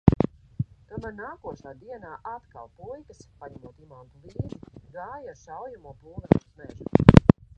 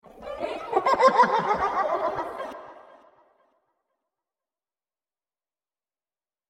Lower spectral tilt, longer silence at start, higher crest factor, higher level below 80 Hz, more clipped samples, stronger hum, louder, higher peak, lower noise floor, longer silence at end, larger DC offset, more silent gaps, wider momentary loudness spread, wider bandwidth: first, -9 dB/octave vs -4.5 dB/octave; about the same, 0.05 s vs 0.15 s; about the same, 26 dB vs 22 dB; first, -38 dBFS vs -62 dBFS; neither; neither; about the same, -22 LUFS vs -24 LUFS; first, 0 dBFS vs -6 dBFS; second, -35 dBFS vs under -90 dBFS; second, 0.4 s vs 3.7 s; neither; neither; first, 27 LU vs 19 LU; second, 8.8 kHz vs 12 kHz